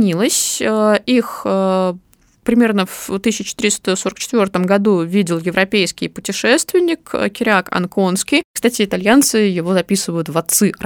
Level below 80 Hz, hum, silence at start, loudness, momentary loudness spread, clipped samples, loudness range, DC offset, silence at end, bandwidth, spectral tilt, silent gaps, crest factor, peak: -52 dBFS; none; 0 s; -16 LUFS; 6 LU; under 0.1%; 2 LU; under 0.1%; 0 s; 19.5 kHz; -4 dB/octave; 8.45-8.54 s; 16 dB; 0 dBFS